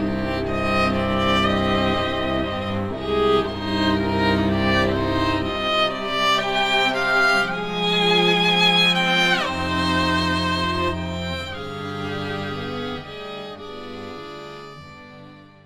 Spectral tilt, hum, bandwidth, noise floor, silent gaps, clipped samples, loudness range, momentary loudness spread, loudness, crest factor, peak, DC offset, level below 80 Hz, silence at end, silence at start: -5 dB/octave; none; 16 kHz; -44 dBFS; none; under 0.1%; 12 LU; 17 LU; -20 LUFS; 16 dB; -6 dBFS; under 0.1%; -40 dBFS; 0.25 s; 0 s